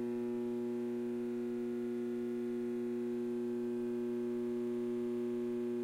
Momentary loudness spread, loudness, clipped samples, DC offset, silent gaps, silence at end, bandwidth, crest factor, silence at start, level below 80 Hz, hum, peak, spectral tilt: 1 LU; -38 LUFS; under 0.1%; under 0.1%; none; 0 s; 12 kHz; 6 dB; 0 s; -76 dBFS; none; -30 dBFS; -7.5 dB/octave